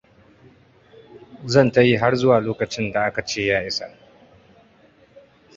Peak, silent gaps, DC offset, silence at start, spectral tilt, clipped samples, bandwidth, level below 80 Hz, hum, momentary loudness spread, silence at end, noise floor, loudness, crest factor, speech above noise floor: -2 dBFS; none; under 0.1%; 1.15 s; -5.5 dB/octave; under 0.1%; 7.8 kHz; -52 dBFS; none; 11 LU; 1.7 s; -54 dBFS; -19 LUFS; 20 dB; 35 dB